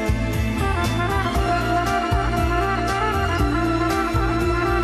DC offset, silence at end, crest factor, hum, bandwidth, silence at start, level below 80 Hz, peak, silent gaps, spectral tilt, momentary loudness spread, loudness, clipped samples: under 0.1%; 0 s; 12 dB; none; 13.5 kHz; 0 s; -28 dBFS; -8 dBFS; none; -6 dB/octave; 1 LU; -21 LUFS; under 0.1%